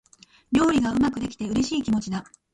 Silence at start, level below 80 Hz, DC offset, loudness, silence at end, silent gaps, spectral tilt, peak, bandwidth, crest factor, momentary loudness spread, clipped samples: 0.5 s; -48 dBFS; under 0.1%; -24 LUFS; 0.3 s; none; -5 dB/octave; -10 dBFS; 11.5 kHz; 16 dB; 10 LU; under 0.1%